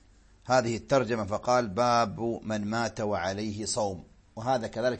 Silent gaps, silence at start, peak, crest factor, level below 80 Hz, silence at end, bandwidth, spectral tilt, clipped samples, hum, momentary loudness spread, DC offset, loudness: none; 0.45 s; -10 dBFS; 18 dB; -58 dBFS; 0 s; 8.8 kHz; -5 dB/octave; under 0.1%; none; 8 LU; under 0.1%; -29 LUFS